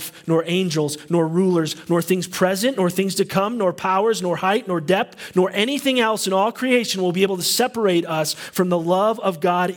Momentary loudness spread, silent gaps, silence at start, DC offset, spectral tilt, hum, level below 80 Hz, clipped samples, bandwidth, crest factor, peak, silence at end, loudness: 3 LU; none; 0 s; under 0.1%; -4.5 dB/octave; none; -66 dBFS; under 0.1%; 18 kHz; 16 dB; -4 dBFS; 0 s; -20 LUFS